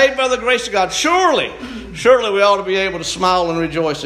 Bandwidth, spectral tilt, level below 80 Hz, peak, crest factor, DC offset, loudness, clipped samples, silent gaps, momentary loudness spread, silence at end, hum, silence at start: 13.5 kHz; -3 dB/octave; -44 dBFS; 0 dBFS; 16 dB; under 0.1%; -15 LUFS; under 0.1%; none; 6 LU; 0 s; none; 0 s